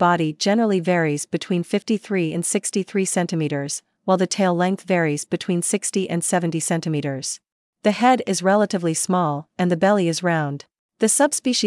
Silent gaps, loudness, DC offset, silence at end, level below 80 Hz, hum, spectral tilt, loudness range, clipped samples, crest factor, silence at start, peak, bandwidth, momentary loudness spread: 7.52-7.73 s, 10.79-10.89 s; -21 LUFS; under 0.1%; 0 s; -74 dBFS; none; -4.5 dB/octave; 2 LU; under 0.1%; 16 dB; 0 s; -4 dBFS; 12 kHz; 7 LU